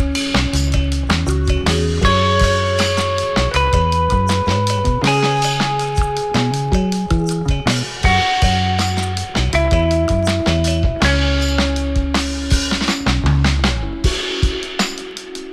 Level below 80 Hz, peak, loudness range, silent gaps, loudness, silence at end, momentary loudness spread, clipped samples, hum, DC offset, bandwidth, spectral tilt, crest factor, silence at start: -22 dBFS; 0 dBFS; 2 LU; none; -17 LUFS; 0 s; 5 LU; under 0.1%; none; under 0.1%; 14 kHz; -5 dB/octave; 16 dB; 0 s